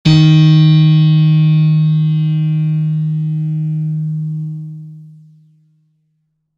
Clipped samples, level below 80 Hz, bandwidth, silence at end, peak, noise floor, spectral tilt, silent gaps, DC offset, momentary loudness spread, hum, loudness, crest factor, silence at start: under 0.1%; -46 dBFS; 6.6 kHz; 1.5 s; 0 dBFS; -66 dBFS; -8 dB/octave; none; under 0.1%; 14 LU; none; -12 LUFS; 12 dB; 0.05 s